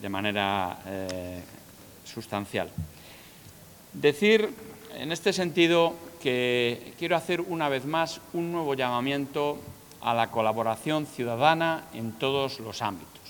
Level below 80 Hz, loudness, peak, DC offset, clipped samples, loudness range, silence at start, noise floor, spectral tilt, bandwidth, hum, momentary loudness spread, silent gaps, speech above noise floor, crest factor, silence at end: -64 dBFS; -27 LUFS; -6 dBFS; under 0.1%; under 0.1%; 7 LU; 0 s; -50 dBFS; -5 dB/octave; 19.5 kHz; none; 19 LU; none; 22 dB; 22 dB; 0 s